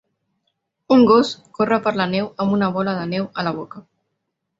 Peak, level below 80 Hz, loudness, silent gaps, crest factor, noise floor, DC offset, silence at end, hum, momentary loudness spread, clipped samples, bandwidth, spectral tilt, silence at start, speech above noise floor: -2 dBFS; -58 dBFS; -19 LUFS; none; 18 dB; -76 dBFS; under 0.1%; 0.8 s; none; 11 LU; under 0.1%; 7.8 kHz; -7 dB/octave; 0.9 s; 58 dB